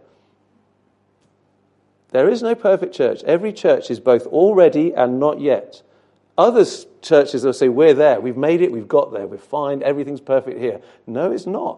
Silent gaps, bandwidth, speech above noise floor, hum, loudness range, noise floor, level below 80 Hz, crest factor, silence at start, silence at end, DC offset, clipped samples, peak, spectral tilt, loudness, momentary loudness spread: none; 11 kHz; 45 dB; 50 Hz at -55 dBFS; 5 LU; -62 dBFS; -70 dBFS; 18 dB; 2.15 s; 0 s; under 0.1%; under 0.1%; 0 dBFS; -6.5 dB/octave; -17 LUFS; 12 LU